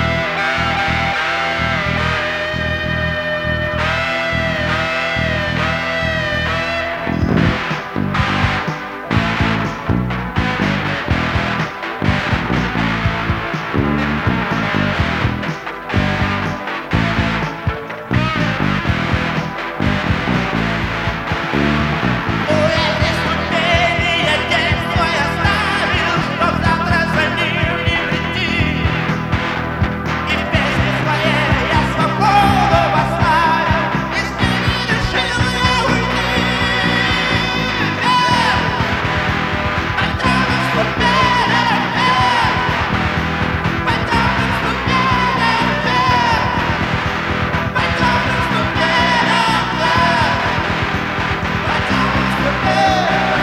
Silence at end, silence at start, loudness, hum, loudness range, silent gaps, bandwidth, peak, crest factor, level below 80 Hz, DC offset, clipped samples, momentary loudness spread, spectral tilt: 0 s; 0 s; -16 LUFS; none; 4 LU; none; 16 kHz; 0 dBFS; 16 dB; -30 dBFS; under 0.1%; under 0.1%; 6 LU; -5.5 dB/octave